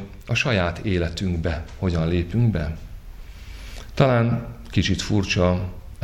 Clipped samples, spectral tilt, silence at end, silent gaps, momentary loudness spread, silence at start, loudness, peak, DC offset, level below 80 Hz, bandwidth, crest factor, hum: under 0.1%; -6 dB/octave; 0 s; none; 19 LU; 0 s; -23 LUFS; -2 dBFS; under 0.1%; -36 dBFS; 12 kHz; 22 dB; none